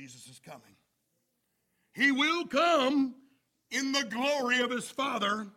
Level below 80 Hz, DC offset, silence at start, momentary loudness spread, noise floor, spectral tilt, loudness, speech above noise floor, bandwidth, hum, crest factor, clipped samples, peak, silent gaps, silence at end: -78 dBFS; under 0.1%; 0 s; 17 LU; -78 dBFS; -2.5 dB/octave; -28 LUFS; 49 dB; 16 kHz; none; 18 dB; under 0.1%; -14 dBFS; none; 0.05 s